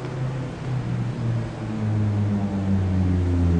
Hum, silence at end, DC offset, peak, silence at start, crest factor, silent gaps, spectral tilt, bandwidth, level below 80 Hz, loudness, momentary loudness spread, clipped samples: none; 0 s; under 0.1%; -10 dBFS; 0 s; 12 dB; none; -8.5 dB/octave; 9 kHz; -38 dBFS; -25 LUFS; 6 LU; under 0.1%